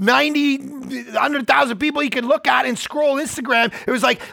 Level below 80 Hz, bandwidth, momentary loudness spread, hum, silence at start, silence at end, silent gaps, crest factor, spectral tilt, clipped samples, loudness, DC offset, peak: -60 dBFS; 19 kHz; 7 LU; none; 0 s; 0 s; none; 16 dB; -3.5 dB/octave; under 0.1%; -18 LUFS; under 0.1%; -2 dBFS